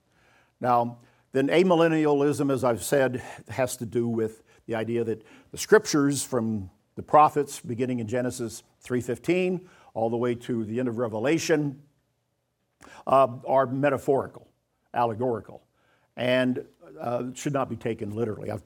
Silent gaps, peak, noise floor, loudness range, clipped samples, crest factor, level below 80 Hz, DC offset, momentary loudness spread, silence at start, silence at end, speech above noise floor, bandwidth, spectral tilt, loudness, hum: none; -6 dBFS; -75 dBFS; 5 LU; under 0.1%; 20 dB; -66 dBFS; under 0.1%; 14 LU; 0.6 s; 0.05 s; 50 dB; 18.5 kHz; -5.5 dB/octave; -26 LUFS; none